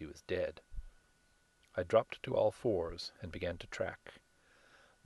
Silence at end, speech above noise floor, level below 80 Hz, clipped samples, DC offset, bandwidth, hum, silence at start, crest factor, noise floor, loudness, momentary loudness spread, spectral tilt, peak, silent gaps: 0.9 s; 35 dB; -56 dBFS; under 0.1%; under 0.1%; 12 kHz; none; 0 s; 22 dB; -71 dBFS; -37 LUFS; 21 LU; -6 dB/octave; -16 dBFS; none